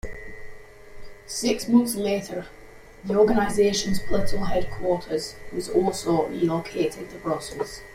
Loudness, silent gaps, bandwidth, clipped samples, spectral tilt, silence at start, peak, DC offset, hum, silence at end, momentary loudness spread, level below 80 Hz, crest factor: -25 LUFS; none; 16 kHz; under 0.1%; -5 dB/octave; 0.05 s; -8 dBFS; under 0.1%; none; 0 s; 15 LU; -42 dBFS; 16 dB